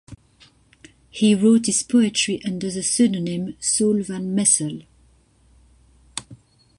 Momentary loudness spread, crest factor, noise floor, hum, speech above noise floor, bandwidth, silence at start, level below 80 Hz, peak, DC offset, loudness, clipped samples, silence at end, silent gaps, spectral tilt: 18 LU; 20 dB; -56 dBFS; none; 37 dB; 11.5 kHz; 0.1 s; -58 dBFS; -4 dBFS; under 0.1%; -19 LUFS; under 0.1%; 0.45 s; none; -4 dB/octave